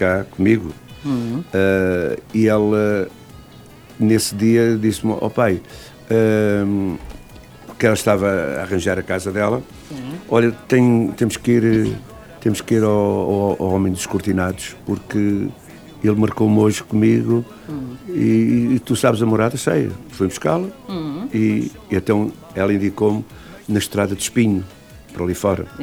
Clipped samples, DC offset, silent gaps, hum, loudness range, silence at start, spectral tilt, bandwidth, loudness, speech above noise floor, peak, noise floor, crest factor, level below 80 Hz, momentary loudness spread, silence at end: under 0.1%; under 0.1%; none; none; 3 LU; 0 s; -6 dB/octave; 19.5 kHz; -18 LUFS; 24 dB; 0 dBFS; -42 dBFS; 18 dB; -46 dBFS; 11 LU; 0 s